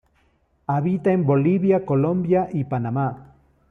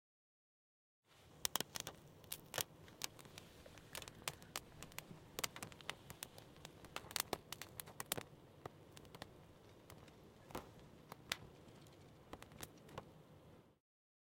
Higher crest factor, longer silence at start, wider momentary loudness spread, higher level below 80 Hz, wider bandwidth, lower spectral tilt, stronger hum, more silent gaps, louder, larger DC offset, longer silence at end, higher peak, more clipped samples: second, 14 dB vs 42 dB; second, 0.7 s vs 1.1 s; second, 8 LU vs 19 LU; first, -56 dBFS vs -74 dBFS; second, 3.7 kHz vs 17 kHz; first, -11.5 dB/octave vs -2 dB/octave; neither; neither; first, -21 LUFS vs -49 LUFS; neither; about the same, 0.5 s vs 0.6 s; first, -8 dBFS vs -12 dBFS; neither